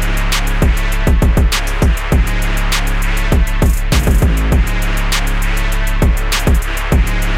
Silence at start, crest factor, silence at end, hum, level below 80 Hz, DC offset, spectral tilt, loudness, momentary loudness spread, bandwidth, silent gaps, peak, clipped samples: 0 s; 10 dB; 0 s; none; -14 dBFS; under 0.1%; -5 dB/octave; -15 LUFS; 4 LU; 16.5 kHz; none; -2 dBFS; under 0.1%